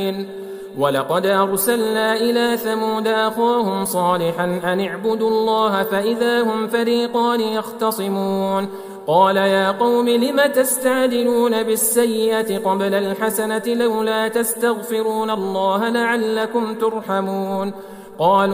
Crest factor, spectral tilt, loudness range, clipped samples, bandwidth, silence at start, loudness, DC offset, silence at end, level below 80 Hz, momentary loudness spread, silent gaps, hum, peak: 16 dB; -4 dB/octave; 3 LU; under 0.1%; 16 kHz; 0 s; -18 LUFS; under 0.1%; 0 s; -64 dBFS; 6 LU; none; none; -2 dBFS